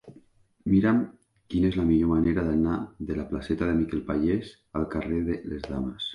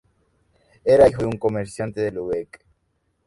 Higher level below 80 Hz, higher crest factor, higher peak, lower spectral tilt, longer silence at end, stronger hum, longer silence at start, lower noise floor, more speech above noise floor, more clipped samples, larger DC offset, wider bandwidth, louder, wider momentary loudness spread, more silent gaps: first, -42 dBFS vs -50 dBFS; second, 14 dB vs 20 dB; second, -12 dBFS vs -2 dBFS; first, -8.5 dB/octave vs -7 dB/octave; second, 0 s vs 0.85 s; neither; second, 0.05 s vs 0.85 s; second, -58 dBFS vs -70 dBFS; second, 32 dB vs 50 dB; neither; neither; about the same, 10.5 kHz vs 11.5 kHz; second, -27 LUFS vs -21 LUFS; second, 10 LU vs 14 LU; neither